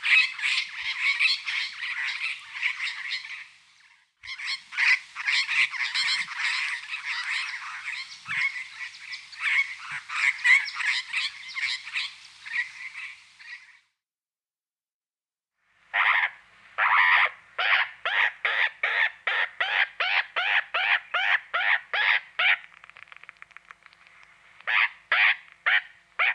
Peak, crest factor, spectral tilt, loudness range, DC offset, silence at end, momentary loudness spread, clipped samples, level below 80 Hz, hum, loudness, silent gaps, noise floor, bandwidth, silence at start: -8 dBFS; 18 dB; 2 dB/octave; 8 LU; under 0.1%; 0 s; 15 LU; under 0.1%; -78 dBFS; none; -24 LUFS; 14.92-15.01 s; under -90 dBFS; 11 kHz; 0 s